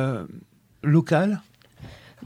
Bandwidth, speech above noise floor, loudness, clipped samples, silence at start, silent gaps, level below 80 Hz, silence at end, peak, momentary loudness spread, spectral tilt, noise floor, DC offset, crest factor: 10.5 kHz; 24 dB; -23 LUFS; under 0.1%; 0 s; none; -60 dBFS; 0 s; -6 dBFS; 25 LU; -8 dB/octave; -46 dBFS; under 0.1%; 18 dB